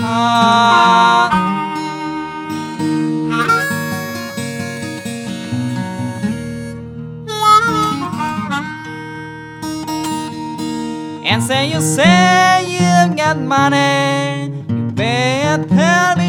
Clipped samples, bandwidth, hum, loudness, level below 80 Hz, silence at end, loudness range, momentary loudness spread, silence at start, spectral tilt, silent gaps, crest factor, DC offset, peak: under 0.1%; 17.5 kHz; none; -15 LUFS; -50 dBFS; 0 s; 9 LU; 15 LU; 0 s; -4.5 dB/octave; none; 16 dB; under 0.1%; 0 dBFS